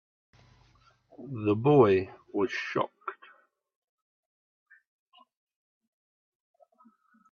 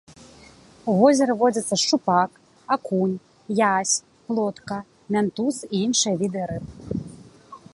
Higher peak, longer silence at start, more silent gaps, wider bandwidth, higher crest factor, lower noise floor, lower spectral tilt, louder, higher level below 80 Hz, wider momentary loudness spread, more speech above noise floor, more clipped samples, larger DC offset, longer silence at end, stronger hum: second, -8 dBFS vs -4 dBFS; first, 1.2 s vs 0.1 s; neither; second, 6.8 kHz vs 11.5 kHz; about the same, 24 dB vs 20 dB; first, -64 dBFS vs -49 dBFS; first, -8 dB/octave vs -4 dB/octave; second, -27 LUFS vs -23 LUFS; second, -72 dBFS vs -56 dBFS; first, 21 LU vs 14 LU; first, 38 dB vs 28 dB; neither; neither; first, 4.2 s vs 0.15 s; neither